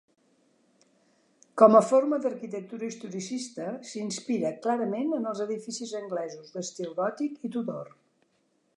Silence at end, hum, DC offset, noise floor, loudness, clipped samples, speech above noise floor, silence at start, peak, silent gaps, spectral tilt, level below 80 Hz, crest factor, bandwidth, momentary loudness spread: 0.9 s; none; under 0.1%; -71 dBFS; -28 LUFS; under 0.1%; 44 dB; 1.55 s; -4 dBFS; none; -5 dB/octave; -84 dBFS; 24 dB; 11 kHz; 17 LU